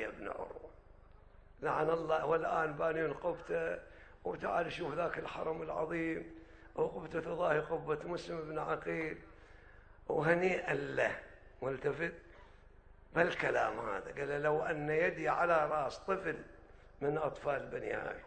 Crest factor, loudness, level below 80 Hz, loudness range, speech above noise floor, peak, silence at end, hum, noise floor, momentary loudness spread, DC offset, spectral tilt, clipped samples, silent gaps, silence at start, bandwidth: 22 dB; -36 LUFS; -60 dBFS; 4 LU; 23 dB; -14 dBFS; 0 s; 50 Hz at -65 dBFS; -59 dBFS; 12 LU; under 0.1%; -6.5 dB/octave; under 0.1%; none; 0 s; 9 kHz